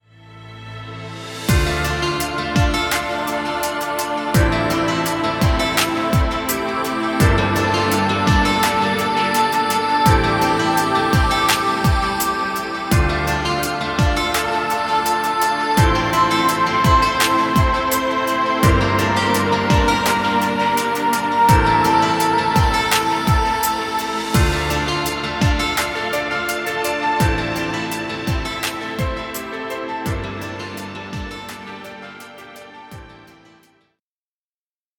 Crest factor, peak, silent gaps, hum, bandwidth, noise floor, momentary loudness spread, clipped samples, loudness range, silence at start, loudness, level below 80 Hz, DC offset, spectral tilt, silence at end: 18 dB; 0 dBFS; none; none; 19 kHz; under -90 dBFS; 13 LU; under 0.1%; 9 LU; 0.25 s; -18 LUFS; -28 dBFS; under 0.1%; -4.5 dB/octave; 1.8 s